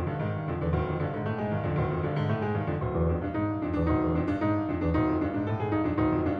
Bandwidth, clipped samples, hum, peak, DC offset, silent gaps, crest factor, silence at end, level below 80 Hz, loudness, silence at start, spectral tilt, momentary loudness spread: 5.2 kHz; under 0.1%; none; -14 dBFS; under 0.1%; none; 14 dB; 0 s; -42 dBFS; -29 LUFS; 0 s; -10.5 dB/octave; 4 LU